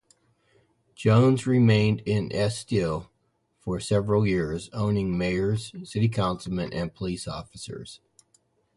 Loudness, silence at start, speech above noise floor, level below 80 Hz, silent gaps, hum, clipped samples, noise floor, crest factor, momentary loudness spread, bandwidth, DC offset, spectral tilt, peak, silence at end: -25 LUFS; 1 s; 47 dB; -48 dBFS; none; none; under 0.1%; -72 dBFS; 18 dB; 16 LU; 11.5 kHz; under 0.1%; -7 dB/octave; -8 dBFS; 0.8 s